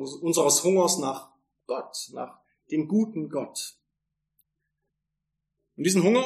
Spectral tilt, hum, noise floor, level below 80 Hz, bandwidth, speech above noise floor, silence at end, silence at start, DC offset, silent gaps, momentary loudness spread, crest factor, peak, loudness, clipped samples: -4 dB/octave; none; -83 dBFS; -78 dBFS; 14 kHz; 58 dB; 0 s; 0 s; under 0.1%; none; 17 LU; 20 dB; -8 dBFS; -25 LUFS; under 0.1%